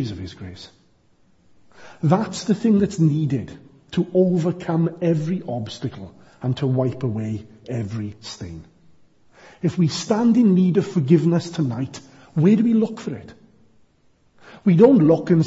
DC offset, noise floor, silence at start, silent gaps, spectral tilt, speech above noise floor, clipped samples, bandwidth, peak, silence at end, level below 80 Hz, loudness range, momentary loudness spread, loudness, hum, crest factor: under 0.1%; -59 dBFS; 0 s; none; -7.5 dB/octave; 40 dB; under 0.1%; 8 kHz; -2 dBFS; 0 s; -56 dBFS; 8 LU; 18 LU; -20 LUFS; none; 18 dB